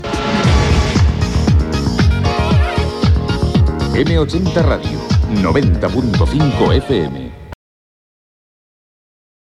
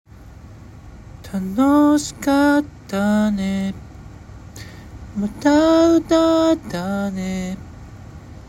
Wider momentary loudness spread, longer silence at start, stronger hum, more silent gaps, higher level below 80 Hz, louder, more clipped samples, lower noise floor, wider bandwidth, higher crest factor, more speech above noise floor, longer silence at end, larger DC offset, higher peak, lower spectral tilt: second, 4 LU vs 25 LU; second, 0 s vs 0.2 s; neither; neither; first, -20 dBFS vs -44 dBFS; first, -15 LUFS vs -18 LUFS; neither; first, under -90 dBFS vs -40 dBFS; second, 11 kHz vs 16 kHz; about the same, 14 dB vs 14 dB; first, over 76 dB vs 23 dB; first, 2 s vs 0.05 s; first, 0.2% vs under 0.1%; first, 0 dBFS vs -4 dBFS; about the same, -6.5 dB/octave vs -6 dB/octave